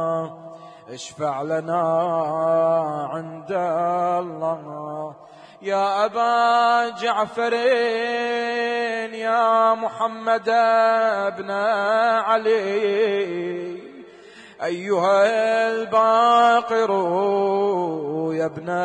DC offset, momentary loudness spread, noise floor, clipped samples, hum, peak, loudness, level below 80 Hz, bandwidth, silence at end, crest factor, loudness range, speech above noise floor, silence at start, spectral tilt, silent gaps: under 0.1%; 13 LU; -45 dBFS; under 0.1%; none; -6 dBFS; -21 LUFS; -74 dBFS; 9.6 kHz; 0 s; 14 dB; 5 LU; 24 dB; 0 s; -5 dB/octave; none